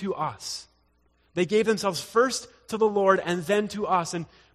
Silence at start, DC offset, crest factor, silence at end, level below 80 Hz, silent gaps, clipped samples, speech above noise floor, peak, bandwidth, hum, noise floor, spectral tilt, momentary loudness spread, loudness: 0 s; under 0.1%; 20 dB; 0.3 s; -64 dBFS; none; under 0.1%; 40 dB; -6 dBFS; 14 kHz; none; -66 dBFS; -4.5 dB/octave; 13 LU; -26 LUFS